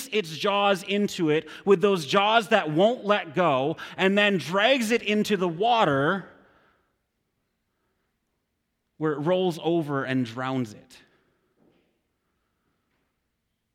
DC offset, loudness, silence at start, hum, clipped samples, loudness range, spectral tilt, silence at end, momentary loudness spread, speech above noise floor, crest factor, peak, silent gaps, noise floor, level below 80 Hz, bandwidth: under 0.1%; -24 LUFS; 0 s; none; under 0.1%; 11 LU; -5 dB/octave; 2.95 s; 8 LU; 54 dB; 20 dB; -6 dBFS; none; -78 dBFS; -70 dBFS; 16 kHz